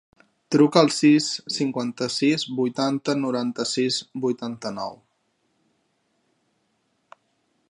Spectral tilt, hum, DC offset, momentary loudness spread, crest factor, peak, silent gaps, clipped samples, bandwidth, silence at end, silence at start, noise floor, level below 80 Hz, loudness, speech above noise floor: -4.5 dB/octave; none; under 0.1%; 13 LU; 24 dB; -2 dBFS; none; under 0.1%; 11 kHz; 2.75 s; 0.5 s; -71 dBFS; -74 dBFS; -23 LUFS; 48 dB